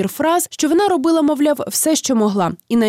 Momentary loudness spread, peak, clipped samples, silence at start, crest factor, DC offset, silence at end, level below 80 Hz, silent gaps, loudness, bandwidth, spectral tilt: 3 LU; -6 dBFS; under 0.1%; 0 s; 10 dB; under 0.1%; 0 s; -58 dBFS; none; -16 LUFS; 16.5 kHz; -4 dB/octave